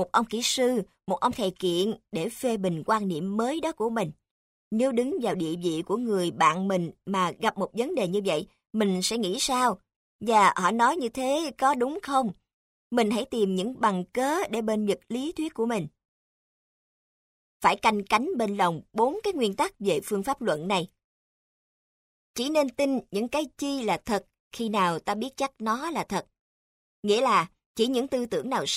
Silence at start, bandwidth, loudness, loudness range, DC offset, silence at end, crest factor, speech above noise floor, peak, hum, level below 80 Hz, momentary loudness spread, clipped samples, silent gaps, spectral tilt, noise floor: 0 s; 16 kHz; -27 LUFS; 5 LU; under 0.1%; 0 s; 20 dB; over 64 dB; -6 dBFS; none; -62 dBFS; 8 LU; under 0.1%; 4.31-4.71 s, 9.96-10.19 s, 12.53-12.90 s, 16.05-17.60 s, 21.04-22.34 s, 24.40-24.51 s, 26.41-27.03 s, 27.66-27.75 s; -4.5 dB/octave; under -90 dBFS